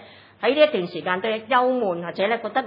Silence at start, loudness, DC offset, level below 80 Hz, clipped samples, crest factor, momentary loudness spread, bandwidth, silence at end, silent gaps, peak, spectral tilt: 0 s; -22 LUFS; under 0.1%; -78 dBFS; under 0.1%; 18 dB; 7 LU; 5.4 kHz; 0 s; none; -4 dBFS; -8 dB/octave